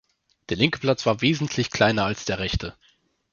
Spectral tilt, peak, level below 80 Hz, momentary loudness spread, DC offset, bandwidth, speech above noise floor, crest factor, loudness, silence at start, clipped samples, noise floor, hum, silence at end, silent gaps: -5 dB/octave; -4 dBFS; -42 dBFS; 8 LU; under 0.1%; 7.2 kHz; 40 dB; 22 dB; -23 LUFS; 0.5 s; under 0.1%; -63 dBFS; none; 0.6 s; none